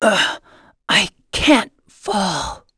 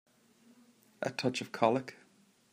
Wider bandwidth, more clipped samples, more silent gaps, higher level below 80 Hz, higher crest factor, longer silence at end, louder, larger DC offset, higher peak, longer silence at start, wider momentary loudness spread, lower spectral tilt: second, 11 kHz vs 15.5 kHz; neither; neither; first, -42 dBFS vs -80 dBFS; about the same, 20 dB vs 24 dB; second, 0.2 s vs 0.6 s; first, -17 LUFS vs -33 LUFS; neither; first, 0 dBFS vs -12 dBFS; second, 0 s vs 1 s; first, 17 LU vs 10 LU; second, -3 dB/octave vs -5 dB/octave